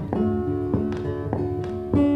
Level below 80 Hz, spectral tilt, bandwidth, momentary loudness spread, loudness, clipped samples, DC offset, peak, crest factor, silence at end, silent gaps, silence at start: -42 dBFS; -10 dB/octave; 6.2 kHz; 4 LU; -25 LUFS; under 0.1%; under 0.1%; -8 dBFS; 16 dB; 0 s; none; 0 s